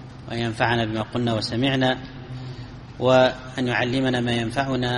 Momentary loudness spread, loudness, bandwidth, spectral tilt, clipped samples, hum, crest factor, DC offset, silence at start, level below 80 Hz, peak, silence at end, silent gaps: 17 LU; -22 LUFS; 11.5 kHz; -6 dB/octave; under 0.1%; none; 20 dB; under 0.1%; 0 s; -48 dBFS; -4 dBFS; 0 s; none